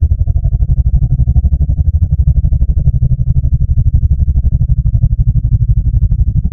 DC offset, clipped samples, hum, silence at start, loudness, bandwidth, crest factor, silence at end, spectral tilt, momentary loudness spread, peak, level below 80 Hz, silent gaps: under 0.1%; 0.2%; none; 0 s; -13 LUFS; 0.8 kHz; 10 dB; 0 s; -13 dB/octave; 2 LU; 0 dBFS; -12 dBFS; none